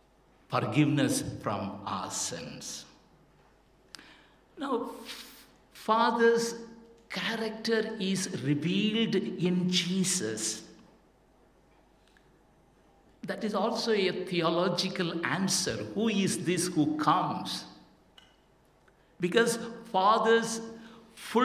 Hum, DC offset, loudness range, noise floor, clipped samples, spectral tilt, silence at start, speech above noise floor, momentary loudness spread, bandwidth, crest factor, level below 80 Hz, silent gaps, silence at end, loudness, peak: none; under 0.1%; 9 LU; -64 dBFS; under 0.1%; -4 dB/octave; 0.5 s; 35 dB; 16 LU; 16 kHz; 22 dB; -66 dBFS; none; 0 s; -29 LUFS; -10 dBFS